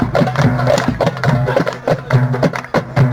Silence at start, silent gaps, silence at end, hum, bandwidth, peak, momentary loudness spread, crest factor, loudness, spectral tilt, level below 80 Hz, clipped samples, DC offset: 0 s; none; 0 s; none; 12 kHz; 0 dBFS; 4 LU; 14 dB; -15 LUFS; -7 dB/octave; -38 dBFS; under 0.1%; under 0.1%